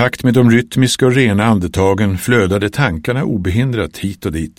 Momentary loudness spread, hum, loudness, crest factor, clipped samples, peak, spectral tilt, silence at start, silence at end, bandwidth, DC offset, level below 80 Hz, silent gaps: 8 LU; none; -14 LUFS; 14 dB; under 0.1%; 0 dBFS; -6 dB/octave; 0 s; 0.1 s; 16.5 kHz; under 0.1%; -36 dBFS; none